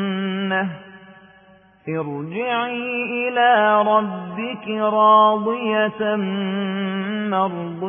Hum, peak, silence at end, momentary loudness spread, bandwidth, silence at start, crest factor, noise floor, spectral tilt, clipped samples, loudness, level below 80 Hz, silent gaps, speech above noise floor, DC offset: none; -4 dBFS; 0 s; 13 LU; 3.6 kHz; 0 s; 16 dB; -51 dBFS; -10.5 dB/octave; under 0.1%; -20 LUFS; -68 dBFS; none; 32 dB; under 0.1%